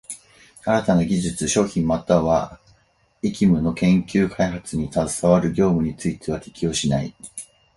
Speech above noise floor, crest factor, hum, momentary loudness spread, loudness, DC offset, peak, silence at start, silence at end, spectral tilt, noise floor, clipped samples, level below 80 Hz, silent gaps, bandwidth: 41 dB; 20 dB; none; 13 LU; -21 LUFS; under 0.1%; -2 dBFS; 0.1 s; 0.3 s; -6 dB/octave; -61 dBFS; under 0.1%; -44 dBFS; none; 11.5 kHz